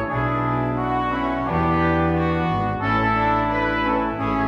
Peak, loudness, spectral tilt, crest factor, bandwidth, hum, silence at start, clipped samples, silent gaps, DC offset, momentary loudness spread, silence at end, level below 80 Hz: -8 dBFS; -21 LUFS; -8.5 dB/octave; 12 dB; 6.8 kHz; none; 0 s; under 0.1%; none; under 0.1%; 3 LU; 0 s; -36 dBFS